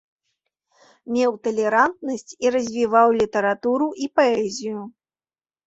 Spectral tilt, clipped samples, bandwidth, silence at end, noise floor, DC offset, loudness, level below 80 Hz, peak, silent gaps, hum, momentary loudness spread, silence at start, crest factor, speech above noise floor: -4.5 dB/octave; under 0.1%; 8 kHz; 0.75 s; under -90 dBFS; under 0.1%; -21 LUFS; -62 dBFS; -4 dBFS; none; none; 13 LU; 1.05 s; 18 dB; over 70 dB